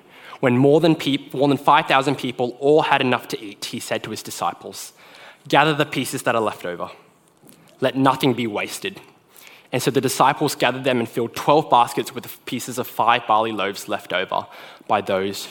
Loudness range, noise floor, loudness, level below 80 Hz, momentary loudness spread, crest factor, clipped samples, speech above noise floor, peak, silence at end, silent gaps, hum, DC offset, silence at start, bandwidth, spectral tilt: 5 LU; -51 dBFS; -20 LUFS; -66 dBFS; 14 LU; 20 dB; under 0.1%; 31 dB; 0 dBFS; 0 s; none; none; under 0.1%; 0.2 s; 17.5 kHz; -4.5 dB/octave